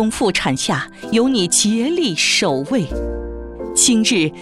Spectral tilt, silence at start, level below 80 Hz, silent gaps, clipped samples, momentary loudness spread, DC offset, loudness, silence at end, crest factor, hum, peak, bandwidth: -3 dB/octave; 0 s; -36 dBFS; none; under 0.1%; 12 LU; under 0.1%; -16 LUFS; 0 s; 16 dB; none; -2 dBFS; 13.5 kHz